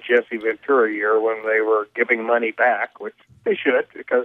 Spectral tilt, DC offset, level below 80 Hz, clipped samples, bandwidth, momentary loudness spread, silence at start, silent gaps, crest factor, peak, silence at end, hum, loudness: -6.5 dB/octave; under 0.1%; -74 dBFS; under 0.1%; 4 kHz; 7 LU; 0.05 s; none; 16 dB; -4 dBFS; 0 s; none; -20 LUFS